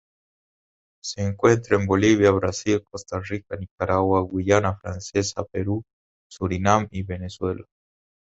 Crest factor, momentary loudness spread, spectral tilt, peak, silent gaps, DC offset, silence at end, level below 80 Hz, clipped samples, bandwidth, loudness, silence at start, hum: 22 dB; 13 LU; -6 dB/octave; -2 dBFS; 3.71-3.78 s, 5.93-6.30 s; under 0.1%; 0.75 s; -42 dBFS; under 0.1%; 8 kHz; -23 LUFS; 1.05 s; none